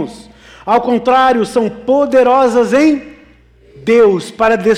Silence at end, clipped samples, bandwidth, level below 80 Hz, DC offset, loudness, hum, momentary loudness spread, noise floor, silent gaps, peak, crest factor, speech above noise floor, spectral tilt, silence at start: 0 s; under 0.1%; 12 kHz; -46 dBFS; under 0.1%; -12 LUFS; none; 8 LU; -45 dBFS; none; -2 dBFS; 10 dB; 33 dB; -5.5 dB/octave; 0 s